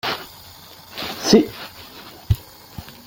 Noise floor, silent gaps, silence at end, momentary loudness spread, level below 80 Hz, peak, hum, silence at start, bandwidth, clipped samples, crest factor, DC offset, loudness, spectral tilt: -43 dBFS; none; 0.15 s; 24 LU; -40 dBFS; -2 dBFS; none; 0.05 s; 17 kHz; under 0.1%; 22 dB; under 0.1%; -20 LUFS; -5 dB/octave